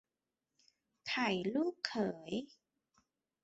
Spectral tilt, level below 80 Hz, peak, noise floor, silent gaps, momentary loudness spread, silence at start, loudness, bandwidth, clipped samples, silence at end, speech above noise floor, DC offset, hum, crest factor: -3 dB/octave; -78 dBFS; -16 dBFS; under -90 dBFS; none; 10 LU; 1.05 s; -37 LUFS; 8 kHz; under 0.1%; 1 s; over 53 dB; under 0.1%; none; 24 dB